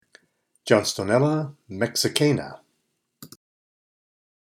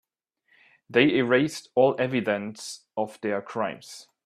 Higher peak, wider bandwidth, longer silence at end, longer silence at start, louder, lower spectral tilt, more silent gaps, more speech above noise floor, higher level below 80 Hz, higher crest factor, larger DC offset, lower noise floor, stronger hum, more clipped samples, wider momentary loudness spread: first, 0 dBFS vs -4 dBFS; first, 17 kHz vs 14 kHz; first, 1.25 s vs 0.25 s; second, 0.65 s vs 0.9 s; about the same, -23 LUFS vs -25 LUFS; about the same, -4.5 dB/octave vs -5 dB/octave; neither; first, 52 dB vs 46 dB; about the same, -68 dBFS vs -70 dBFS; about the same, 26 dB vs 22 dB; neither; about the same, -74 dBFS vs -71 dBFS; neither; neither; about the same, 13 LU vs 14 LU